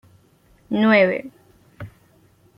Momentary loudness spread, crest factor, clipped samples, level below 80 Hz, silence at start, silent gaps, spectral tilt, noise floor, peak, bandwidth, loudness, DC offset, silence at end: 25 LU; 20 dB; under 0.1%; -60 dBFS; 0.7 s; none; -7.5 dB/octave; -56 dBFS; -4 dBFS; 5.6 kHz; -18 LUFS; under 0.1%; 0.7 s